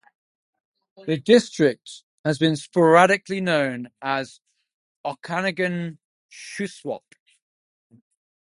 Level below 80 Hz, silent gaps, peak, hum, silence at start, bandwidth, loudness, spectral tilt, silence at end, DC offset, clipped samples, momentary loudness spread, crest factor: -68 dBFS; 2.03-2.24 s, 4.74-5.04 s, 6.05-6.29 s; 0 dBFS; none; 1 s; 11.5 kHz; -22 LUFS; -5.5 dB/octave; 1.55 s; under 0.1%; under 0.1%; 20 LU; 24 dB